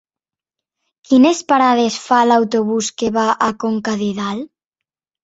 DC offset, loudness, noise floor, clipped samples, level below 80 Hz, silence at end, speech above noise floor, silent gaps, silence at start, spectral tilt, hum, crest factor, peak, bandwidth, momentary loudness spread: under 0.1%; -16 LUFS; -89 dBFS; under 0.1%; -58 dBFS; 0.8 s; 74 dB; none; 1.1 s; -4.5 dB/octave; none; 16 dB; -2 dBFS; 8 kHz; 9 LU